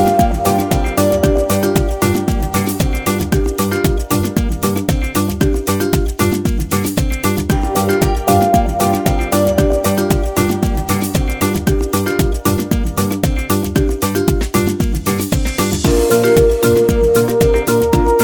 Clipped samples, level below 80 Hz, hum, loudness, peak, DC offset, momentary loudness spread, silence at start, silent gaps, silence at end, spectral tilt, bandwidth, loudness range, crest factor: under 0.1%; -22 dBFS; none; -15 LUFS; 0 dBFS; under 0.1%; 5 LU; 0 s; none; 0 s; -5.5 dB/octave; over 20 kHz; 3 LU; 14 dB